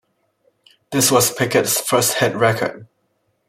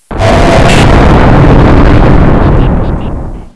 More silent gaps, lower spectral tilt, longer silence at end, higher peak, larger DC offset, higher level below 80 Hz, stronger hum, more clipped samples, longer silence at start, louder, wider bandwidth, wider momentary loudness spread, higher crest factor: neither; second, -3 dB/octave vs -7 dB/octave; first, 0.65 s vs 0.05 s; about the same, -2 dBFS vs 0 dBFS; neither; second, -58 dBFS vs -8 dBFS; neither; second, under 0.1% vs 10%; first, 0.9 s vs 0.1 s; second, -17 LUFS vs -6 LUFS; first, 16.5 kHz vs 11 kHz; about the same, 9 LU vs 10 LU; first, 18 dB vs 4 dB